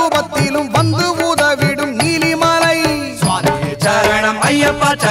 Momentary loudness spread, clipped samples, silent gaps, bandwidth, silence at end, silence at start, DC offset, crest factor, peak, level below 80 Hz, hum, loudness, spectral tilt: 4 LU; under 0.1%; none; 16.5 kHz; 0 s; 0 s; under 0.1%; 12 dB; -2 dBFS; -40 dBFS; none; -14 LUFS; -4.5 dB/octave